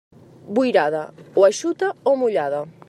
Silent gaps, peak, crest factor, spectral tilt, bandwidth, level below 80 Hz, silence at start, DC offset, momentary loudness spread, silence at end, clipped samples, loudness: none; -4 dBFS; 18 dB; -4.5 dB/octave; 11.5 kHz; -72 dBFS; 0.45 s; under 0.1%; 8 LU; 0.2 s; under 0.1%; -20 LUFS